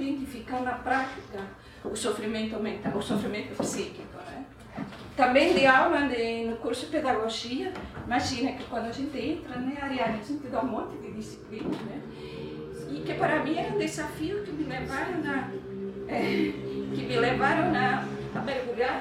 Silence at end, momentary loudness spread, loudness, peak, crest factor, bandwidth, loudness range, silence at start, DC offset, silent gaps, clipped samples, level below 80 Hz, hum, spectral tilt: 0 s; 15 LU; -29 LUFS; -8 dBFS; 22 dB; 15.5 kHz; 8 LU; 0 s; under 0.1%; none; under 0.1%; -54 dBFS; none; -5 dB/octave